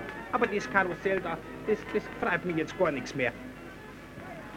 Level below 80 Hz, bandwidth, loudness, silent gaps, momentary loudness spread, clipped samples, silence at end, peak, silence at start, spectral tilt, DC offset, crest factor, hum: -56 dBFS; 16.5 kHz; -30 LUFS; none; 17 LU; under 0.1%; 0 s; -10 dBFS; 0 s; -5.5 dB/octave; under 0.1%; 22 dB; none